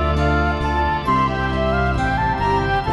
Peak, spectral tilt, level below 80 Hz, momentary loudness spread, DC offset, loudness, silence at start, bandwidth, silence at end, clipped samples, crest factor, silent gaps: -6 dBFS; -7 dB/octave; -26 dBFS; 2 LU; under 0.1%; -19 LUFS; 0 s; 11.5 kHz; 0 s; under 0.1%; 12 dB; none